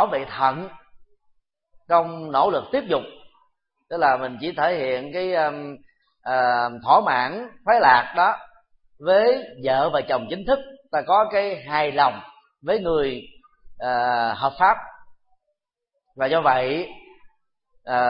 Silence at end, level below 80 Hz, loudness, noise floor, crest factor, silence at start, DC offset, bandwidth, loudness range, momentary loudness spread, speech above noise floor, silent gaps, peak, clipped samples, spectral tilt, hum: 0 s; -54 dBFS; -21 LUFS; -79 dBFS; 22 dB; 0 s; under 0.1%; 5.4 kHz; 5 LU; 13 LU; 58 dB; none; -2 dBFS; under 0.1%; -9 dB/octave; none